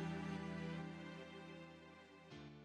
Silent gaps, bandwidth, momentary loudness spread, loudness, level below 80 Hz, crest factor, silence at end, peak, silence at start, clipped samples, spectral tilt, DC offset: none; 10 kHz; 13 LU; -51 LUFS; -72 dBFS; 14 dB; 0 s; -36 dBFS; 0 s; under 0.1%; -6.5 dB/octave; under 0.1%